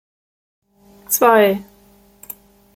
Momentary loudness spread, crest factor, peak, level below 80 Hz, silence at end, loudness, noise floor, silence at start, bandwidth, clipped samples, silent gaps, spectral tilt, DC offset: 23 LU; 18 dB; -2 dBFS; -60 dBFS; 1.15 s; -15 LUFS; -51 dBFS; 1.1 s; 17 kHz; under 0.1%; none; -3.5 dB/octave; under 0.1%